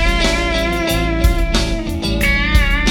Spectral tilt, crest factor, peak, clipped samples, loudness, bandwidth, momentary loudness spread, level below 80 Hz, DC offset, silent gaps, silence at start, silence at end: -4.5 dB/octave; 14 dB; 0 dBFS; under 0.1%; -16 LUFS; 18 kHz; 5 LU; -18 dBFS; under 0.1%; none; 0 s; 0 s